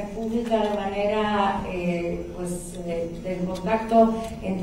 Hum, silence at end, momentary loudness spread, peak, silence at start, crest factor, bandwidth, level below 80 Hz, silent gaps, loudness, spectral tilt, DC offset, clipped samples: none; 0 s; 12 LU; -8 dBFS; 0 s; 18 dB; 15.5 kHz; -44 dBFS; none; -25 LUFS; -6 dB/octave; under 0.1%; under 0.1%